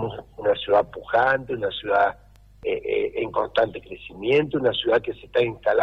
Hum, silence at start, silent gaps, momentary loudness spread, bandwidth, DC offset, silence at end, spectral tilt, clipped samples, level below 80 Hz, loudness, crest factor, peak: none; 0 s; none; 9 LU; 6.4 kHz; under 0.1%; 0 s; -7 dB/octave; under 0.1%; -52 dBFS; -23 LUFS; 14 dB; -10 dBFS